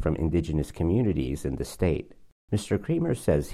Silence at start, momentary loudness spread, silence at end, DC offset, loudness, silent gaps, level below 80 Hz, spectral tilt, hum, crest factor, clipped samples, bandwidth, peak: 0 s; 6 LU; 0 s; under 0.1%; -28 LUFS; 2.32-2.48 s; -40 dBFS; -7.5 dB/octave; none; 18 dB; under 0.1%; 15 kHz; -10 dBFS